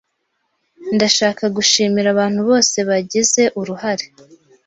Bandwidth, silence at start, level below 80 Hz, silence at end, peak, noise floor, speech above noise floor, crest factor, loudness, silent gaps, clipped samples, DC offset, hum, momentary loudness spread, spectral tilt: 8.2 kHz; 0.8 s; -60 dBFS; 0.6 s; 0 dBFS; -70 dBFS; 54 dB; 18 dB; -15 LUFS; none; under 0.1%; under 0.1%; none; 9 LU; -2.5 dB/octave